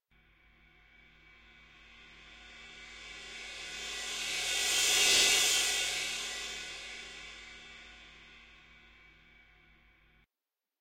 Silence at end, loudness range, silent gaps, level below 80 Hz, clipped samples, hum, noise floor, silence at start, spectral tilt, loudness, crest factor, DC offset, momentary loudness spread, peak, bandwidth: 2.3 s; 21 LU; none; -64 dBFS; under 0.1%; none; under -90 dBFS; 1.9 s; 1.5 dB/octave; -29 LUFS; 22 dB; under 0.1%; 27 LU; -14 dBFS; 16.5 kHz